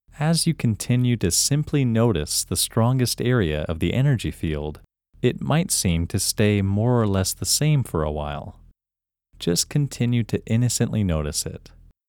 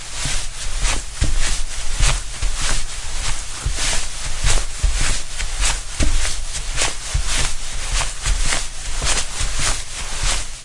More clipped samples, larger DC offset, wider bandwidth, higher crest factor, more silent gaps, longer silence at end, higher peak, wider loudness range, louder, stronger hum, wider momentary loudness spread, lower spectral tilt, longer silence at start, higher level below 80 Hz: neither; neither; first, 19 kHz vs 11.5 kHz; about the same, 16 dB vs 16 dB; neither; first, 0.5 s vs 0 s; second, -6 dBFS vs -2 dBFS; about the same, 3 LU vs 1 LU; about the same, -22 LUFS vs -22 LUFS; neither; about the same, 8 LU vs 6 LU; first, -5 dB/octave vs -1.5 dB/octave; first, 0.15 s vs 0 s; second, -40 dBFS vs -22 dBFS